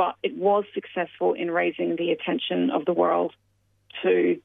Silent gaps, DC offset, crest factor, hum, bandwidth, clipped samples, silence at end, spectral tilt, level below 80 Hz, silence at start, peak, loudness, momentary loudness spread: none; under 0.1%; 16 dB; none; 3.9 kHz; under 0.1%; 0.05 s; -8.5 dB/octave; -76 dBFS; 0 s; -10 dBFS; -25 LUFS; 8 LU